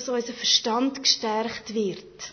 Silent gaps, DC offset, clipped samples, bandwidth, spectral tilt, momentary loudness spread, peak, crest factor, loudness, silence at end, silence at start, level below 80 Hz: none; under 0.1%; under 0.1%; 6.6 kHz; -2 dB/octave; 9 LU; -6 dBFS; 20 dB; -24 LUFS; 0 s; 0 s; -64 dBFS